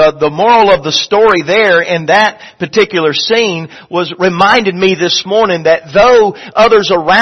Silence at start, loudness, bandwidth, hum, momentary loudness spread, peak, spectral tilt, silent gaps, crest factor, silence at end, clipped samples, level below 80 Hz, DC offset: 0 s; -9 LUFS; 8.2 kHz; none; 7 LU; 0 dBFS; -4 dB/octave; none; 10 dB; 0 s; 0.2%; -44 dBFS; under 0.1%